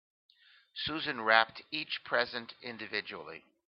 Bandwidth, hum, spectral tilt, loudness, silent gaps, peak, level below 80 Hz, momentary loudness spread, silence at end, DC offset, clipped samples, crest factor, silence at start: 6 kHz; none; 0.5 dB/octave; -32 LUFS; none; -6 dBFS; -72 dBFS; 18 LU; 0.3 s; under 0.1%; under 0.1%; 28 dB; 0.75 s